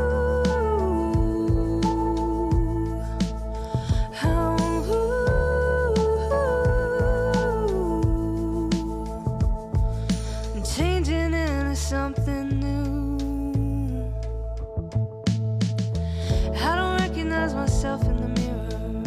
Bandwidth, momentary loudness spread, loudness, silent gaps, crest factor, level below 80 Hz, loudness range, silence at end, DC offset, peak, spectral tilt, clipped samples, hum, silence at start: 13.5 kHz; 6 LU; -25 LUFS; none; 12 dB; -28 dBFS; 4 LU; 0 s; under 0.1%; -12 dBFS; -6.5 dB/octave; under 0.1%; none; 0 s